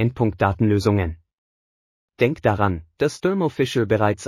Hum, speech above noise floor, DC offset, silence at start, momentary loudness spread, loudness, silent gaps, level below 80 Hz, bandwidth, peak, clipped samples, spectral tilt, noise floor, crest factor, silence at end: none; over 70 dB; under 0.1%; 0 s; 5 LU; -21 LUFS; 1.33-2.08 s; -44 dBFS; 14 kHz; -4 dBFS; under 0.1%; -7 dB/octave; under -90 dBFS; 18 dB; 0 s